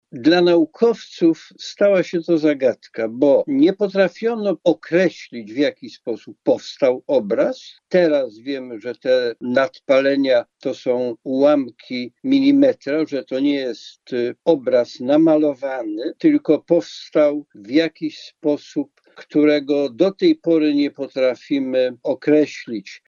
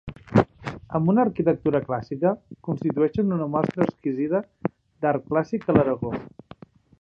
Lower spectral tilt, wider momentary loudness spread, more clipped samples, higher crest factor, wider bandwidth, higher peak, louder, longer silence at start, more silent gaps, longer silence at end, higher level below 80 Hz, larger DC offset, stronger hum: second, -6.5 dB/octave vs -9.5 dB/octave; about the same, 12 LU vs 11 LU; neither; about the same, 16 dB vs 20 dB; about the same, 7.2 kHz vs 7.6 kHz; about the same, -2 dBFS vs -4 dBFS; first, -19 LUFS vs -24 LUFS; about the same, 0.15 s vs 0.05 s; neither; second, 0.1 s vs 0.75 s; second, -74 dBFS vs -52 dBFS; neither; neither